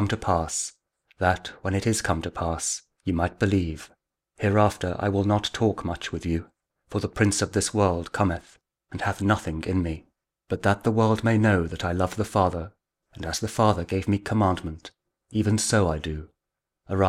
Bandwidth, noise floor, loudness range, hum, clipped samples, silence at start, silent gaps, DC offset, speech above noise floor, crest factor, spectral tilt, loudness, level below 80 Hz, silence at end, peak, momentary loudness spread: 15 kHz; -85 dBFS; 2 LU; none; under 0.1%; 0 s; none; under 0.1%; 60 dB; 20 dB; -5.5 dB/octave; -25 LUFS; -44 dBFS; 0 s; -6 dBFS; 11 LU